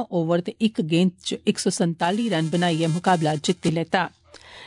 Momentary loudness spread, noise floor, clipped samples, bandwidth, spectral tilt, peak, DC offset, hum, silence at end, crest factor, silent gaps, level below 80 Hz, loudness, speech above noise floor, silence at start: 4 LU; -45 dBFS; under 0.1%; 11 kHz; -5.5 dB/octave; -6 dBFS; under 0.1%; none; 0 s; 16 dB; none; -66 dBFS; -23 LUFS; 23 dB; 0 s